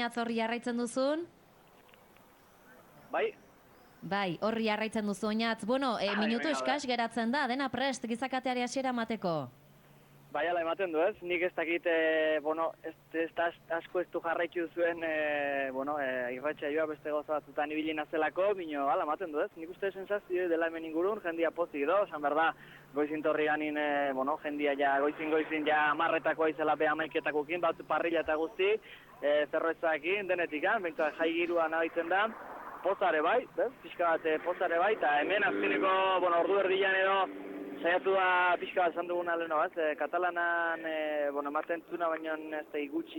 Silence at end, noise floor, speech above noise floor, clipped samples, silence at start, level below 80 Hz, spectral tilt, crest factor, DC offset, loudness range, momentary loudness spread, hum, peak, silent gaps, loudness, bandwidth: 0 s; -60 dBFS; 29 dB; under 0.1%; 0 s; -72 dBFS; -4.5 dB/octave; 14 dB; under 0.1%; 5 LU; 8 LU; none; -18 dBFS; none; -32 LUFS; 17.5 kHz